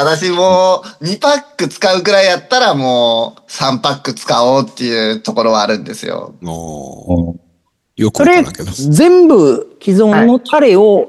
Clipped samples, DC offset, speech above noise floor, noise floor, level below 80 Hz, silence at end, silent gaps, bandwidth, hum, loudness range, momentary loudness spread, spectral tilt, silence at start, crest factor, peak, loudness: under 0.1%; under 0.1%; 48 dB; -59 dBFS; -44 dBFS; 0 s; none; 12.5 kHz; none; 6 LU; 15 LU; -5 dB/octave; 0 s; 12 dB; 0 dBFS; -11 LUFS